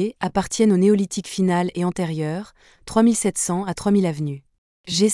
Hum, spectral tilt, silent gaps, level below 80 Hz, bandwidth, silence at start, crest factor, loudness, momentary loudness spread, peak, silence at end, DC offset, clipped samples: none; -5 dB/octave; 4.58-4.84 s; -52 dBFS; 12 kHz; 0 s; 14 dB; -21 LUFS; 11 LU; -6 dBFS; 0 s; under 0.1%; under 0.1%